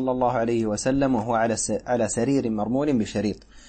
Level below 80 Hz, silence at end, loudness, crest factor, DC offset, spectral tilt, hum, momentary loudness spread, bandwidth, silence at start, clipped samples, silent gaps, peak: -48 dBFS; 0 s; -24 LUFS; 14 dB; under 0.1%; -5.5 dB/octave; none; 3 LU; 8.8 kHz; 0 s; under 0.1%; none; -10 dBFS